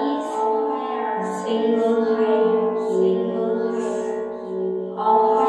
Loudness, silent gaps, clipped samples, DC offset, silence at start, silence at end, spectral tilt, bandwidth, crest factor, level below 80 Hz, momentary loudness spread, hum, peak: -22 LUFS; none; under 0.1%; under 0.1%; 0 s; 0 s; -6.5 dB/octave; 9.8 kHz; 14 dB; -66 dBFS; 8 LU; none; -6 dBFS